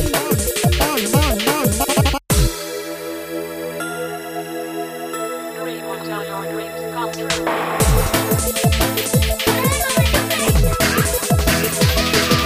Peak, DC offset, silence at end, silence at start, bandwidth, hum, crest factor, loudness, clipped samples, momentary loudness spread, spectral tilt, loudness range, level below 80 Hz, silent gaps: -2 dBFS; under 0.1%; 0 s; 0 s; 15.5 kHz; none; 16 dB; -18 LUFS; under 0.1%; 11 LU; -4 dB/octave; 9 LU; -26 dBFS; none